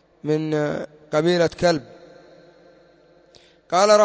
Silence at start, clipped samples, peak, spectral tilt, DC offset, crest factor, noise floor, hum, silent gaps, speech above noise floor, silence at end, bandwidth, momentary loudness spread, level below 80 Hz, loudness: 0.25 s; under 0.1%; -4 dBFS; -5 dB/octave; under 0.1%; 18 dB; -54 dBFS; none; none; 35 dB; 0 s; 8 kHz; 8 LU; -56 dBFS; -21 LUFS